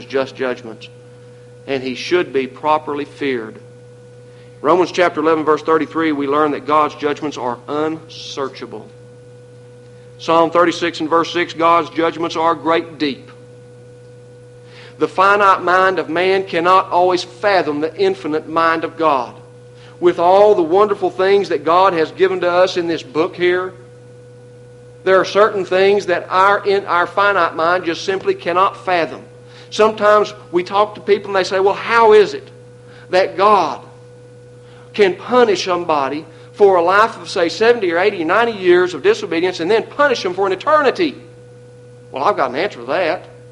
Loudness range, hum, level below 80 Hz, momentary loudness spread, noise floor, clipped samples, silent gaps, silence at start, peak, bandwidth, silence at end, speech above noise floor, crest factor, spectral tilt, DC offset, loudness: 6 LU; none; -60 dBFS; 11 LU; -40 dBFS; under 0.1%; none; 0 s; 0 dBFS; 11 kHz; 0.2 s; 25 dB; 16 dB; -5 dB/octave; under 0.1%; -15 LUFS